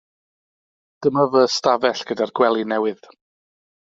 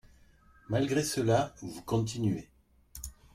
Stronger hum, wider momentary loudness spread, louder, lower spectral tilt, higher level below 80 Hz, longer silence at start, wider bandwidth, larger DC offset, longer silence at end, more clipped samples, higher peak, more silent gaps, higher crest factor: neither; second, 8 LU vs 17 LU; first, -19 LUFS vs -31 LUFS; second, -3 dB/octave vs -5.5 dB/octave; second, -66 dBFS vs -56 dBFS; first, 1 s vs 0.7 s; second, 7.8 kHz vs 16.5 kHz; neither; first, 0.9 s vs 0.25 s; neither; first, -2 dBFS vs -14 dBFS; neither; about the same, 18 dB vs 18 dB